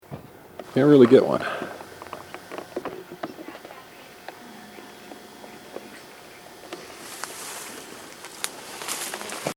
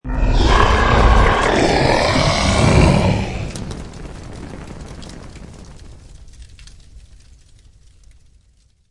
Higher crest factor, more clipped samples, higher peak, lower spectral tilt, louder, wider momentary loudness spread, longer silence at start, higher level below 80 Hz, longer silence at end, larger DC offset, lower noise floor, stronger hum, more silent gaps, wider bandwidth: first, 24 dB vs 18 dB; neither; about the same, -2 dBFS vs 0 dBFS; about the same, -5 dB/octave vs -5.5 dB/octave; second, -23 LUFS vs -15 LUFS; first, 25 LU vs 22 LU; about the same, 0.1 s vs 0.05 s; second, -68 dBFS vs -22 dBFS; second, 0.05 s vs 1.9 s; neither; second, -45 dBFS vs -55 dBFS; neither; neither; first, over 20 kHz vs 11.5 kHz